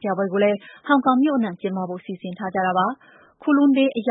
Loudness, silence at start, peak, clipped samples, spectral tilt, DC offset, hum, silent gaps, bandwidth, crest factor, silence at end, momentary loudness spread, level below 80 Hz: -21 LUFS; 0 s; -6 dBFS; under 0.1%; -11 dB/octave; under 0.1%; none; none; 4 kHz; 16 dB; 0 s; 13 LU; -70 dBFS